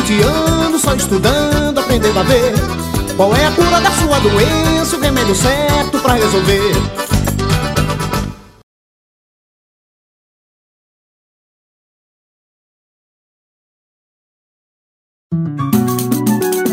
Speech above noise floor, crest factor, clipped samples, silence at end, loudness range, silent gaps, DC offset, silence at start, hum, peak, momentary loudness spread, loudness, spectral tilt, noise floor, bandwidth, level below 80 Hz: over 78 dB; 14 dB; under 0.1%; 0 s; 11 LU; 8.63-15.30 s; under 0.1%; 0 s; none; 0 dBFS; 7 LU; -13 LUFS; -4.5 dB/octave; under -90 dBFS; 16.5 kHz; -28 dBFS